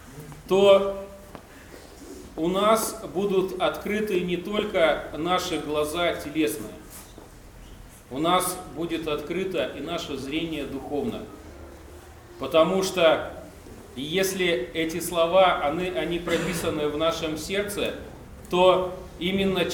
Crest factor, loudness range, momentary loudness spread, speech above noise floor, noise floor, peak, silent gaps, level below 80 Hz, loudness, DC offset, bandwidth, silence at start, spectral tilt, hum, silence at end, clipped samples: 20 dB; 5 LU; 22 LU; 21 dB; -46 dBFS; -6 dBFS; none; -48 dBFS; -25 LUFS; under 0.1%; over 20 kHz; 0 s; -4.5 dB/octave; none; 0 s; under 0.1%